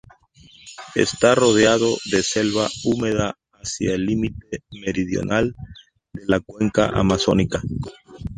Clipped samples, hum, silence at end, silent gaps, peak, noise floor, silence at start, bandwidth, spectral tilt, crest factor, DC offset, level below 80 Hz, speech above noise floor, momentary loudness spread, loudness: under 0.1%; none; 0 s; none; -2 dBFS; -50 dBFS; 0.65 s; 10.5 kHz; -4.5 dB/octave; 20 dB; under 0.1%; -42 dBFS; 30 dB; 18 LU; -20 LUFS